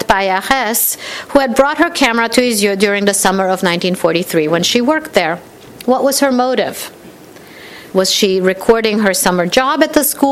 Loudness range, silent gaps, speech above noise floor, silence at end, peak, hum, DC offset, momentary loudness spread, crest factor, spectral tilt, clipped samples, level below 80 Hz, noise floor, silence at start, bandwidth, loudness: 3 LU; none; 24 dB; 0 s; 0 dBFS; none; under 0.1%; 7 LU; 14 dB; -3 dB/octave; 0.1%; -44 dBFS; -37 dBFS; 0 s; 16.5 kHz; -13 LUFS